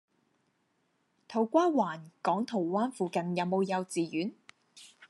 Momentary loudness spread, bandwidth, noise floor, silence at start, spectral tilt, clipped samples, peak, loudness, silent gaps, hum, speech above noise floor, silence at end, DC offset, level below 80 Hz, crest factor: 9 LU; 12 kHz; -75 dBFS; 1.3 s; -6 dB/octave; under 0.1%; -14 dBFS; -31 LUFS; none; none; 45 dB; 0.05 s; under 0.1%; -86 dBFS; 20 dB